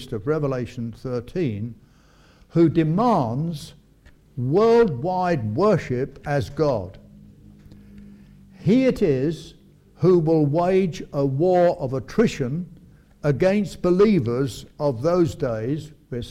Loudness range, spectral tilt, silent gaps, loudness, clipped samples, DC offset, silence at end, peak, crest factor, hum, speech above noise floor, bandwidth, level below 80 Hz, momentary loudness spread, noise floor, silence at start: 4 LU; -8 dB/octave; none; -22 LUFS; under 0.1%; under 0.1%; 0 s; -8 dBFS; 16 dB; none; 33 dB; 14 kHz; -48 dBFS; 12 LU; -53 dBFS; 0 s